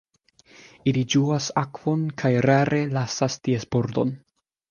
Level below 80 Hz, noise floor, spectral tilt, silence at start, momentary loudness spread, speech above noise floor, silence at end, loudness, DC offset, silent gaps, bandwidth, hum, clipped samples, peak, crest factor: -58 dBFS; -58 dBFS; -6 dB/octave; 0.85 s; 7 LU; 35 dB; 0.55 s; -23 LUFS; under 0.1%; none; 7.2 kHz; none; under 0.1%; -4 dBFS; 20 dB